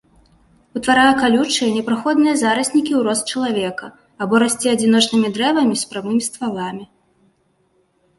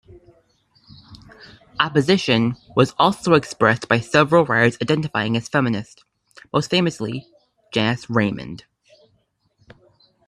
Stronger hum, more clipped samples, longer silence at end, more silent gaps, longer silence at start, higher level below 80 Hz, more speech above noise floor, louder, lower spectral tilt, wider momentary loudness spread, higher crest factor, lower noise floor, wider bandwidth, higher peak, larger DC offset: neither; neither; second, 1.35 s vs 1.7 s; neither; second, 0.75 s vs 1.1 s; about the same, -56 dBFS vs -56 dBFS; about the same, 45 dB vs 46 dB; about the same, -17 LUFS vs -19 LUFS; second, -3.5 dB/octave vs -5.5 dB/octave; about the same, 12 LU vs 13 LU; about the same, 16 dB vs 20 dB; about the same, -62 dBFS vs -65 dBFS; about the same, 12 kHz vs 12 kHz; about the same, -2 dBFS vs 0 dBFS; neither